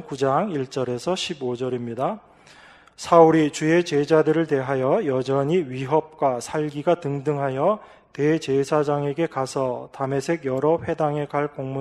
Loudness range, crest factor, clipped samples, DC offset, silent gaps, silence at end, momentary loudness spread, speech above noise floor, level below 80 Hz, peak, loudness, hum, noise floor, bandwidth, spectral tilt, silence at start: 4 LU; 20 dB; under 0.1%; under 0.1%; none; 0 s; 9 LU; 27 dB; -62 dBFS; -2 dBFS; -22 LUFS; none; -49 dBFS; 12.5 kHz; -6 dB/octave; 0 s